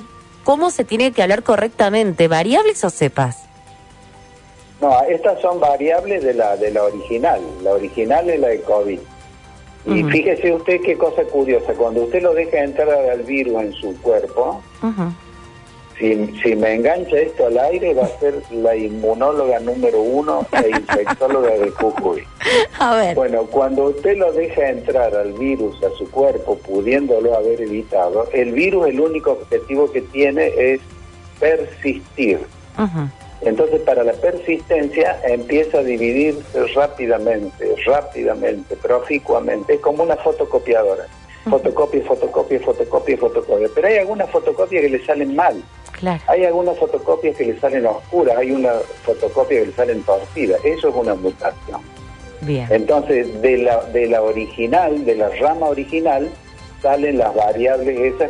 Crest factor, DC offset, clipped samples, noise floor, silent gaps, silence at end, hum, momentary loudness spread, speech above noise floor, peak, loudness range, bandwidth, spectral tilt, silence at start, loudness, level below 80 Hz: 14 dB; under 0.1%; under 0.1%; -43 dBFS; none; 0 s; none; 6 LU; 27 dB; -2 dBFS; 2 LU; 11 kHz; -6 dB/octave; 0 s; -17 LUFS; -44 dBFS